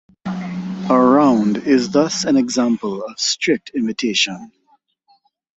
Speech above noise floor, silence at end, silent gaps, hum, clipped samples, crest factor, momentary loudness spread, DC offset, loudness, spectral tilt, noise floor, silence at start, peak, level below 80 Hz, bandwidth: 44 dB; 1.1 s; none; none; under 0.1%; 16 dB; 13 LU; under 0.1%; -17 LUFS; -4 dB/octave; -60 dBFS; 0.25 s; -2 dBFS; -60 dBFS; 8.2 kHz